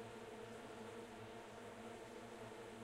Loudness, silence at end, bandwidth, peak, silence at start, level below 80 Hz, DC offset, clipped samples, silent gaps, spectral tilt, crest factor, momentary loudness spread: -54 LUFS; 0 s; 16 kHz; -40 dBFS; 0 s; -76 dBFS; under 0.1%; under 0.1%; none; -4.5 dB/octave; 12 dB; 1 LU